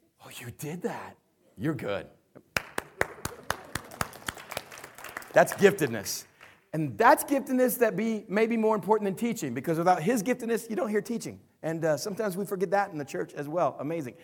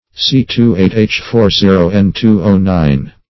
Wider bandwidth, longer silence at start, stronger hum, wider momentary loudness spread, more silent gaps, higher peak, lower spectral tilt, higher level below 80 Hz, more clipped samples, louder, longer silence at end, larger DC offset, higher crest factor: first, 19 kHz vs 6.2 kHz; about the same, 0.25 s vs 0.15 s; neither; first, 16 LU vs 3 LU; neither; second, -6 dBFS vs 0 dBFS; second, -5 dB/octave vs -7 dB/octave; second, -62 dBFS vs -30 dBFS; second, under 0.1% vs 0.3%; second, -29 LUFS vs -11 LUFS; about the same, 0.1 s vs 0.2 s; neither; first, 24 dB vs 10 dB